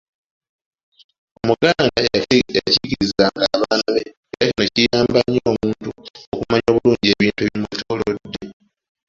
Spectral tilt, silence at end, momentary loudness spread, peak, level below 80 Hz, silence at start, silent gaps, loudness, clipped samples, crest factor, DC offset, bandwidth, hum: -5 dB/octave; 0.55 s; 13 LU; 0 dBFS; -46 dBFS; 1.45 s; 4.17-4.23 s, 6.10-6.14 s, 6.27-6.32 s; -18 LUFS; under 0.1%; 18 dB; under 0.1%; 7.8 kHz; none